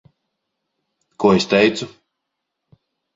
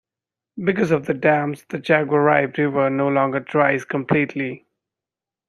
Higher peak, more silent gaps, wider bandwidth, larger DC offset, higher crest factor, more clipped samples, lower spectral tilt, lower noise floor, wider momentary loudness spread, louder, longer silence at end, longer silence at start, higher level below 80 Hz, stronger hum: about the same, -2 dBFS vs -2 dBFS; neither; second, 7.8 kHz vs 12 kHz; neither; about the same, 20 dB vs 20 dB; neither; second, -5 dB/octave vs -7.5 dB/octave; second, -78 dBFS vs -88 dBFS; first, 15 LU vs 11 LU; first, -17 LUFS vs -20 LUFS; first, 1.25 s vs 0.9 s; first, 1.2 s vs 0.55 s; about the same, -56 dBFS vs -60 dBFS; neither